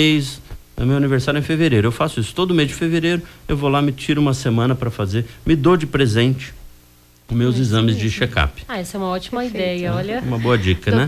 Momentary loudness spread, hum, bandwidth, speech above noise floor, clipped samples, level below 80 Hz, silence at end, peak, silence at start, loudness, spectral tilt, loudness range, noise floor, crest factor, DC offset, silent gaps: 8 LU; none; 15 kHz; 32 dB; under 0.1%; -36 dBFS; 0 s; -4 dBFS; 0 s; -19 LUFS; -6.5 dB/octave; 2 LU; -50 dBFS; 14 dB; under 0.1%; none